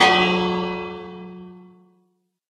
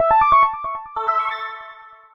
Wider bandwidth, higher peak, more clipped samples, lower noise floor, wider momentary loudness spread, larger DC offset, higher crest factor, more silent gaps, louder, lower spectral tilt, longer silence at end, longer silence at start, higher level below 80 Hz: first, 12.5 kHz vs 6.2 kHz; about the same, -2 dBFS vs -4 dBFS; neither; first, -67 dBFS vs -42 dBFS; first, 24 LU vs 19 LU; neither; first, 22 dB vs 16 dB; neither; second, -21 LUFS vs -18 LUFS; about the same, -4.5 dB/octave vs -5 dB/octave; first, 0.9 s vs 0.25 s; about the same, 0 s vs 0 s; second, -54 dBFS vs -48 dBFS